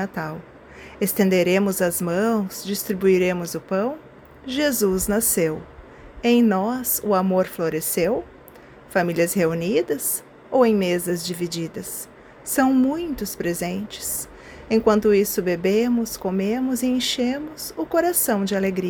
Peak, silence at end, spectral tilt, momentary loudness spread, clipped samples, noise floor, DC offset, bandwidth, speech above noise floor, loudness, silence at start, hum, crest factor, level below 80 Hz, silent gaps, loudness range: -4 dBFS; 0 s; -4.5 dB/octave; 11 LU; under 0.1%; -45 dBFS; under 0.1%; over 20 kHz; 24 dB; -22 LUFS; 0 s; none; 18 dB; -50 dBFS; none; 2 LU